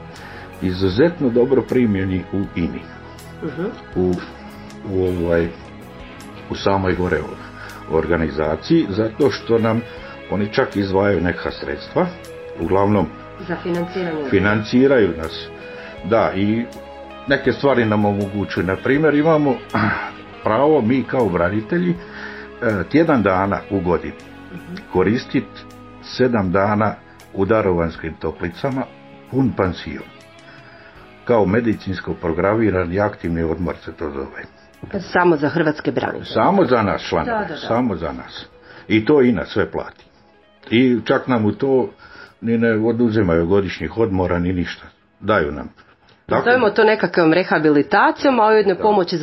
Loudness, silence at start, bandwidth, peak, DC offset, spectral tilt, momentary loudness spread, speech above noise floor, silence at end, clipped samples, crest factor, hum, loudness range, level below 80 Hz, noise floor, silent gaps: -18 LUFS; 0 s; 12 kHz; 0 dBFS; 0.1%; -7.5 dB/octave; 18 LU; 34 dB; 0 s; under 0.1%; 18 dB; none; 5 LU; -44 dBFS; -52 dBFS; none